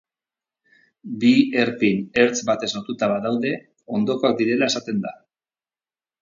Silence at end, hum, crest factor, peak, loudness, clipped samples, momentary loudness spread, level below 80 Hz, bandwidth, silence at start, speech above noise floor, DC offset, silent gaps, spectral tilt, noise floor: 1.1 s; none; 20 dB; -2 dBFS; -21 LUFS; under 0.1%; 10 LU; -64 dBFS; 7.6 kHz; 1.05 s; over 70 dB; under 0.1%; none; -4.5 dB/octave; under -90 dBFS